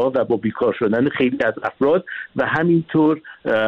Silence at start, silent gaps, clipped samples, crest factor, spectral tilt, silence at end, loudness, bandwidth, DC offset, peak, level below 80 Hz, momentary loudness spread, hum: 0 s; none; under 0.1%; 12 dB; -8.5 dB/octave; 0 s; -19 LUFS; 6 kHz; under 0.1%; -6 dBFS; -56 dBFS; 5 LU; none